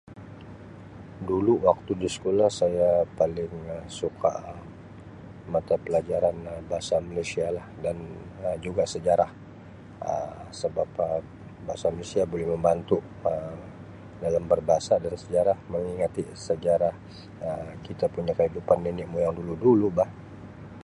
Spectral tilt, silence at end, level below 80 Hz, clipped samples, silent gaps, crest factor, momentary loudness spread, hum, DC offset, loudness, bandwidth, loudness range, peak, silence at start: -6.5 dB/octave; 0 s; -50 dBFS; under 0.1%; none; 22 dB; 21 LU; none; under 0.1%; -27 LUFS; 11 kHz; 4 LU; -4 dBFS; 0.05 s